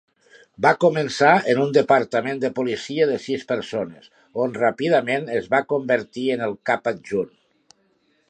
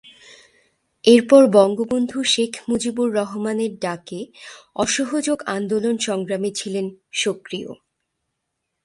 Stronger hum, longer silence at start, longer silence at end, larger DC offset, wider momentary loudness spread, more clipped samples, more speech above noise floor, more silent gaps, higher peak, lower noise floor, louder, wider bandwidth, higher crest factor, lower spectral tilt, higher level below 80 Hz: neither; second, 0.6 s vs 1.05 s; about the same, 1 s vs 1.1 s; neither; second, 9 LU vs 18 LU; neither; second, 44 dB vs 58 dB; neither; about the same, -2 dBFS vs 0 dBFS; second, -64 dBFS vs -78 dBFS; about the same, -21 LUFS vs -19 LUFS; second, 9.6 kHz vs 11.5 kHz; about the same, 20 dB vs 20 dB; first, -5.5 dB/octave vs -4 dB/octave; about the same, -66 dBFS vs -62 dBFS